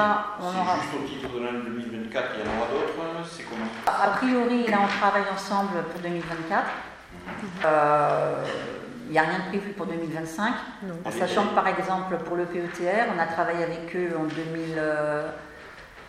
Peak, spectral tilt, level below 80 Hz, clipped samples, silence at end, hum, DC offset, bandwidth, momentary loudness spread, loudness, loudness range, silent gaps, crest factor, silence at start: -6 dBFS; -5.5 dB/octave; -58 dBFS; under 0.1%; 0 s; none; under 0.1%; 16 kHz; 12 LU; -27 LUFS; 3 LU; none; 22 dB; 0 s